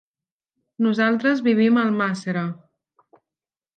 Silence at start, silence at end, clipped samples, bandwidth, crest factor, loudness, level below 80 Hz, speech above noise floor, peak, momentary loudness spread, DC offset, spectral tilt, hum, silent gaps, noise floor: 0.8 s; 1.25 s; under 0.1%; 9 kHz; 16 dB; -21 LUFS; -74 dBFS; over 70 dB; -8 dBFS; 10 LU; under 0.1%; -7 dB/octave; none; none; under -90 dBFS